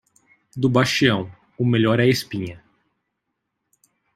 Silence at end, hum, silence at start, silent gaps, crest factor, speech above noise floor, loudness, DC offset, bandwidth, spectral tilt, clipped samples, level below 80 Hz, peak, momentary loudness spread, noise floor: 1.6 s; none; 0.55 s; none; 20 dB; 59 dB; -20 LUFS; under 0.1%; 15.5 kHz; -5.5 dB/octave; under 0.1%; -58 dBFS; -2 dBFS; 16 LU; -78 dBFS